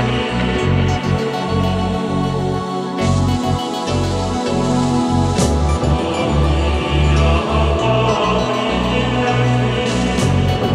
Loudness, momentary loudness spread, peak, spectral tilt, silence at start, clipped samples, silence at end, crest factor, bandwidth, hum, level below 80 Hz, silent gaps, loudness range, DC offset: -17 LUFS; 4 LU; -2 dBFS; -6 dB/octave; 0 s; under 0.1%; 0 s; 14 dB; 12 kHz; none; -24 dBFS; none; 3 LU; under 0.1%